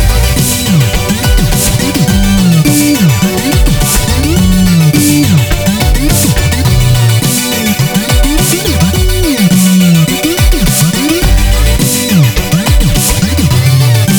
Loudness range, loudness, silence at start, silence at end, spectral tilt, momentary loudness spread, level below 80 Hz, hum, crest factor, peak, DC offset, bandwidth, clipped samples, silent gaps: 1 LU; -9 LUFS; 0 s; 0 s; -4.5 dB/octave; 3 LU; -14 dBFS; none; 8 dB; 0 dBFS; under 0.1%; over 20 kHz; under 0.1%; none